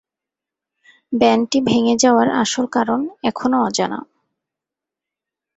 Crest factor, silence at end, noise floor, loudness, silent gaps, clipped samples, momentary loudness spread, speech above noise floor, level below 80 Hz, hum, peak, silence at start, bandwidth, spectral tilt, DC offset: 18 dB; 1.55 s; -86 dBFS; -17 LUFS; none; under 0.1%; 9 LU; 70 dB; -58 dBFS; none; -2 dBFS; 1.1 s; 8.2 kHz; -4 dB/octave; under 0.1%